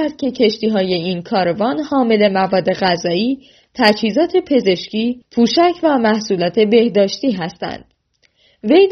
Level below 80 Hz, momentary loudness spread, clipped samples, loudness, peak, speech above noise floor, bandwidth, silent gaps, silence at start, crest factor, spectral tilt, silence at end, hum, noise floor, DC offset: -56 dBFS; 8 LU; under 0.1%; -16 LUFS; 0 dBFS; 45 dB; 6.6 kHz; none; 0 s; 16 dB; -4 dB/octave; 0 s; none; -60 dBFS; under 0.1%